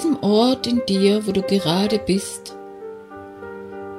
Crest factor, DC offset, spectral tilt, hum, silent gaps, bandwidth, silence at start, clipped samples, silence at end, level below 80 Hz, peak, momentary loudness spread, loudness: 16 dB; under 0.1%; -5.5 dB/octave; none; none; 15 kHz; 0 s; under 0.1%; 0 s; -52 dBFS; -6 dBFS; 19 LU; -19 LUFS